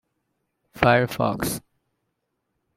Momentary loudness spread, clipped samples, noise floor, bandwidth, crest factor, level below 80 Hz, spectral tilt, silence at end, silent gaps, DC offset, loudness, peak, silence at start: 10 LU; under 0.1%; -77 dBFS; 16 kHz; 24 dB; -52 dBFS; -5 dB/octave; 1.2 s; none; under 0.1%; -22 LUFS; -2 dBFS; 0.75 s